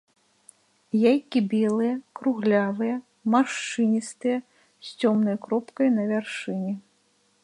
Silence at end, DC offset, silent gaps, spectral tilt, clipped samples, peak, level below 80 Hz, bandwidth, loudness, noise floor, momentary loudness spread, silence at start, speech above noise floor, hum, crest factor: 0.65 s; under 0.1%; none; -6 dB/octave; under 0.1%; -8 dBFS; -76 dBFS; 11 kHz; -25 LUFS; -66 dBFS; 8 LU; 0.95 s; 42 dB; none; 18 dB